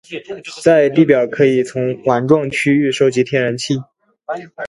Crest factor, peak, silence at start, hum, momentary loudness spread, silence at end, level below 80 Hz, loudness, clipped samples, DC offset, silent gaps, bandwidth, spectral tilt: 16 dB; 0 dBFS; 0.1 s; none; 16 LU; 0 s; -56 dBFS; -15 LUFS; under 0.1%; under 0.1%; none; 11.5 kHz; -6 dB/octave